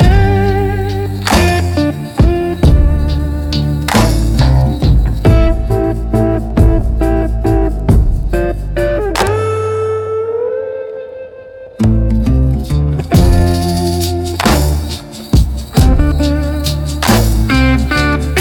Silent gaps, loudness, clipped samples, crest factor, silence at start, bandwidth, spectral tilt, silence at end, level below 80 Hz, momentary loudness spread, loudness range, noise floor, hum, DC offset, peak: none; -13 LUFS; under 0.1%; 12 dB; 0 s; 17.5 kHz; -6 dB/octave; 0 s; -16 dBFS; 6 LU; 4 LU; -32 dBFS; none; under 0.1%; 0 dBFS